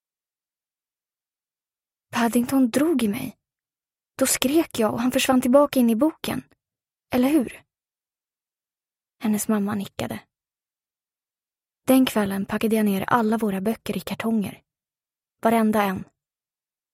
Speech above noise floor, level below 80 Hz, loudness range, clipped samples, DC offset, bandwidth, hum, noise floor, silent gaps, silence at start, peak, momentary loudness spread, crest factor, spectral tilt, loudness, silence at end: over 68 dB; -58 dBFS; 8 LU; under 0.1%; under 0.1%; 16 kHz; none; under -90 dBFS; none; 2.15 s; -2 dBFS; 13 LU; 22 dB; -4.5 dB/octave; -22 LUFS; 0.9 s